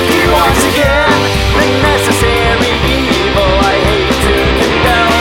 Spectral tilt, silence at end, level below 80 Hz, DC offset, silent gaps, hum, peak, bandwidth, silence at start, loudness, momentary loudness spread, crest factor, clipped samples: -4.5 dB/octave; 0 s; -20 dBFS; 0.3%; none; none; 0 dBFS; 17.5 kHz; 0 s; -10 LUFS; 2 LU; 10 dB; under 0.1%